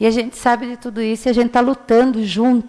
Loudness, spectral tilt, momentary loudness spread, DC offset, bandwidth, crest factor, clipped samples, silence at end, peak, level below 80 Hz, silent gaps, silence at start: -17 LUFS; -5 dB/octave; 7 LU; under 0.1%; 11 kHz; 12 dB; under 0.1%; 0 s; -4 dBFS; -46 dBFS; none; 0 s